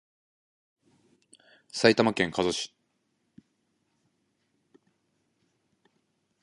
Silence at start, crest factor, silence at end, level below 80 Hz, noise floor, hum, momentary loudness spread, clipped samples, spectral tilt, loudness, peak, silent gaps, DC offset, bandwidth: 1.75 s; 30 dB; 3.75 s; -66 dBFS; -76 dBFS; none; 16 LU; under 0.1%; -4 dB/octave; -26 LUFS; -2 dBFS; none; under 0.1%; 11.5 kHz